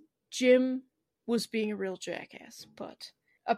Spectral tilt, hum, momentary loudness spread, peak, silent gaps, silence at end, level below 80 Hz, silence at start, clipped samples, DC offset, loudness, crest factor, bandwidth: -4 dB/octave; none; 23 LU; -12 dBFS; none; 0 s; -80 dBFS; 0.3 s; under 0.1%; under 0.1%; -30 LUFS; 20 dB; 14 kHz